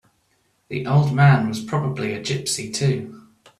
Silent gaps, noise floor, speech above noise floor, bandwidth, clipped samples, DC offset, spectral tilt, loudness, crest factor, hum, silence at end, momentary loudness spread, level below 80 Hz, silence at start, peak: none; -65 dBFS; 46 dB; 13 kHz; under 0.1%; under 0.1%; -5.5 dB/octave; -21 LUFS; 18 dB; none; 0.4 s; 13 LU; -56 dBFS; 0.7 s; -4 dBFS